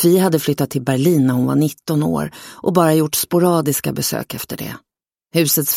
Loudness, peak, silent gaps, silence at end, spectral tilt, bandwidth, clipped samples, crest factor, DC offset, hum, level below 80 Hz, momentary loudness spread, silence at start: -17 LUFS; -2 dBFS; none; 0 s; -5 dB/octave; 16.5 kHz; under 0.1%; 16 dB; under 0.1%; none; -54 dBFS; 12 LU; 0 s